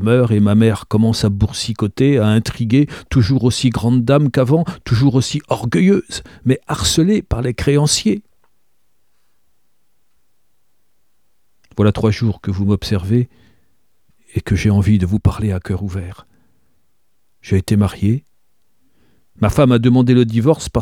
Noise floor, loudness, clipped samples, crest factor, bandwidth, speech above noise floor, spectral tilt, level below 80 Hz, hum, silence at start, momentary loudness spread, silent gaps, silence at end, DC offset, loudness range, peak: -69 dBFS; -16 LUFS; under 0.1%; 16 dB; 15 kHz; 54 dB; -6.5 dB/octave; -36 dBFS; none; 0 s; 8 LU; none; 0 s; 0.2%; 7 LU; 0 dBFS